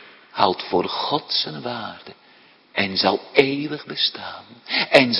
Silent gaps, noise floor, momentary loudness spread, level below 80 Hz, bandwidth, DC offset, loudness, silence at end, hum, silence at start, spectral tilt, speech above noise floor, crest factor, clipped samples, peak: none; -52 dBFS; 16 LU; -66 dBFS; 11 kHz; under 0.1%; -21 LUFS; 0 s; none; 0 s; -5 dB/octave; 31 dB; 22 dB; under 0.1%; 0 dBFS